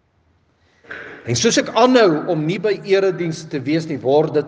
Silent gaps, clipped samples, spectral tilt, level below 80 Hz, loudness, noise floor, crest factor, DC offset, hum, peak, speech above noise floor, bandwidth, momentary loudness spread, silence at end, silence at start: none; under 0.1%; -4.5 dB/octave; -62 dBFS; -17 LUFS; -60 dBFS; 18 dB; under 0.1%; none; 0 dBFS; 43 dB; 10 kHz; 15 LU; 0 s; 0.9 s